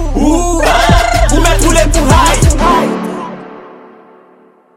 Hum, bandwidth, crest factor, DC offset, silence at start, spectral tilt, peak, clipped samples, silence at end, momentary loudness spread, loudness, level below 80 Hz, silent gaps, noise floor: none; 16.5 kHz; 10 dB; under 0.1%; 0 s; -4.5 dB/octave; 0 dBFS; 0.2%; 1.1 s; 14 LU; -10 LUFS; -14 dBFS; none; -45 dBFS